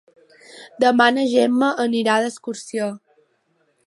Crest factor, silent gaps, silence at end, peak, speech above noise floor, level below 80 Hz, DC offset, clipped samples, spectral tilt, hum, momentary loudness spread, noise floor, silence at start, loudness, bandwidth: 20 dB; none; 0.9 s; -2 dBFS; 47 dB; -76 dBFS; under 0.1%; under 0.1%; -4 dB/octave; none; 13 LU; -65 dBFS; 0.55 s; -19 LUFS; 11.5 kHz